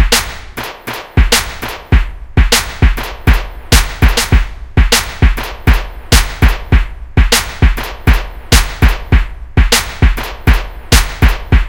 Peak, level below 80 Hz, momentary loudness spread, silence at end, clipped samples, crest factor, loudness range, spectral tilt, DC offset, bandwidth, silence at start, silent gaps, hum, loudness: 0 dBFS; -14 dBFS; 6 LU; 0 s; 0.5%; 12 dB; 1 LU; -3.5 dB/octave; 0.3%; 17 kHz; 0 s; none; none; -13 LUFS